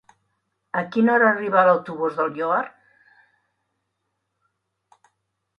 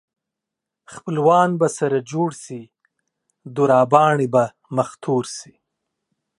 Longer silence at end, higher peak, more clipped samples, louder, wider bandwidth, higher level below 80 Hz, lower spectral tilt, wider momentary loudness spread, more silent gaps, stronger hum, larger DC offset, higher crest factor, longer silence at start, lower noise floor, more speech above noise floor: first, 2.9 s vs 0.95 s; second, -4 dBFS vs 0 dBFS; neither; about the same, -20 LUFS vs -19 LUFS; second, 6.4 kHz vs 11.5 kHz; second, -74 dBFS vs -68 dBFS; first, -8 dB/octave vs -6 dB/octave; second, 11 LU vs 19 LU; neither; neither; neither; about the same, 20 dB vs 20 dB; second, 0.75 s vs 0.9 s; second, -77 dBFS vs -84 dBFS; second, 57 dB vs 66 dB